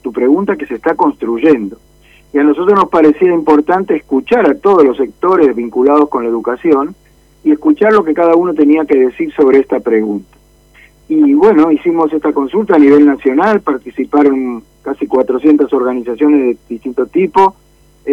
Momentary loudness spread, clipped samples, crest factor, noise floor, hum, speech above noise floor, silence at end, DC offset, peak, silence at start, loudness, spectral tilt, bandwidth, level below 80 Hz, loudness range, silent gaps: 9 LU; under 0.1%; 10 dB; -44 dBFS; none; 34 dB; 0 s; under 0.1%; 0 dBFS; 0.05 s; -11 LUFS; -8 dB/octave; 5.8 kHz; -48 dBFS; 3 LU; none